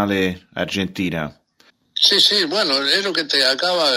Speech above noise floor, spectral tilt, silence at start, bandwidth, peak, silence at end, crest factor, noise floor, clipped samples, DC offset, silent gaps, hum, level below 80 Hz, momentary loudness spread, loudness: 39 dB; -3 dB/octave; 0 s; 16 kHz; -2 dBFS; 0 s; 18 dB; -57 dBFS; under 0.1%; under 0.1%; none; none; -58 dBFS; 14 LU; -17 LUFS